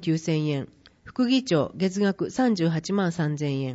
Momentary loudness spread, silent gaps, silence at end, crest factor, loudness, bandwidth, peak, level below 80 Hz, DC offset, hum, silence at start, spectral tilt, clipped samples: 6 LU; none; 0 s; 14 dB; -25 LUFS; 8 kHz; -12 dBFS; -62 dBFS; under 0.1%; none; 0 s; -6.5 dB/octave; under 0.1%